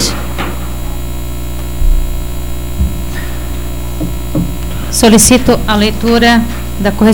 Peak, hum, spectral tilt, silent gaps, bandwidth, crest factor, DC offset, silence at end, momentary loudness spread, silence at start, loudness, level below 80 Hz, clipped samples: 0 dBFS; 60 Hz at -20 dBFS; -4 dB/octave; none; 18 kHz; 12 dB; 8%; 0 s; 15 LU; 0 s; -13 LUFS; -18 dBFS; under 0.1%